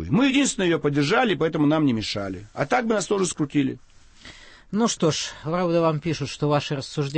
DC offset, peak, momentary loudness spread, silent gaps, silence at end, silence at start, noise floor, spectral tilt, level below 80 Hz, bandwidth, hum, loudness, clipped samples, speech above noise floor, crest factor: under 0.1%; -6 dBFS; 8 LU; none; 0 s; 0 s; -46 dBFS; -5 dB/octave; -52 dBFS; 8.8 kHz; none; -23 LUFS; under 0.1%; 24 dB; 16 dB